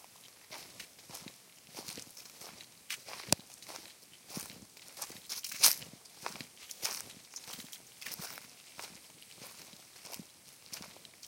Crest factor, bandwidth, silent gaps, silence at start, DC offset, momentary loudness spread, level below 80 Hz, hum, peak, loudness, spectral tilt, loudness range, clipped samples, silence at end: 38 dB; 17 kHz; none; 0 s; under 0.1%; 18 LU; -74 dBFS; none; -2 dBFS; -37 LUFS; -0.5 dB/octave; 13 LU; under 0.1%; 0 s